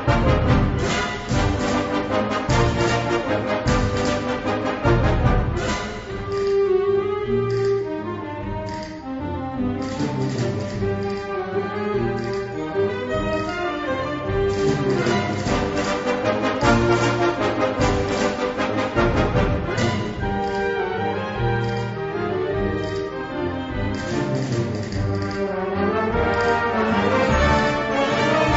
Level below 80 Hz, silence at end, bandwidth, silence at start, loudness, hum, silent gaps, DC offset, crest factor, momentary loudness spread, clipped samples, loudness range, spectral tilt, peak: -32 dBFS; 0 s; 8 kHz; 0 s; -22 LUFS; none; none; under 0.1%; 16 dB; 8 LU; under 0.1%; 5 LU; -6 dB/octave; -4 dBFS